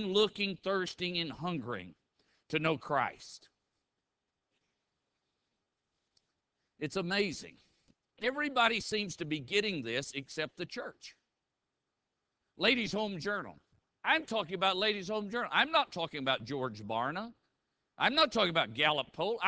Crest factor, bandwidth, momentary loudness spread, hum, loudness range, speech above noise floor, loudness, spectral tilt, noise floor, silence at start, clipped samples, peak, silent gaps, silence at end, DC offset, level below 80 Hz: 24 dB; 8 kHz; 13 LU; none; 8 LU; 54 dB; -33 LUFS; -4 dB/octave; -87 dBFS; 0 s; under 0.1%; -12 dBFS; none; 0 s; under 0.1%; -70 dBFS